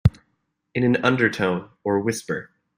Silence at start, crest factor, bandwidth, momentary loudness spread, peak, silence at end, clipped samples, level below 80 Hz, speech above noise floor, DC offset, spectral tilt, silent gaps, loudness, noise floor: 0.05 s; 20 dB; 16 kHz; 11 LU; -2 dBFS; 0.35 s; under 0.1%; -42 dBFS; 51 dB; under 0.1%; -6 dB/octave; none; -23 LUFS; -73 dBFS